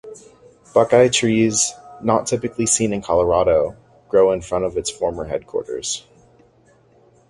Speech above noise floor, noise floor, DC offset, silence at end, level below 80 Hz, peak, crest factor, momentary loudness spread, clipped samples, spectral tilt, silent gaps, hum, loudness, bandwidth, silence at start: 36 dB; -54 dBFS; under 0.1%; 1.3 s; -46 dBFS; 0 dBFS; 20 dB; 11 LU; under 0.1%; -4 dB/octave; none; none; -19 LUFS; 11.5 kHz; 0.05 s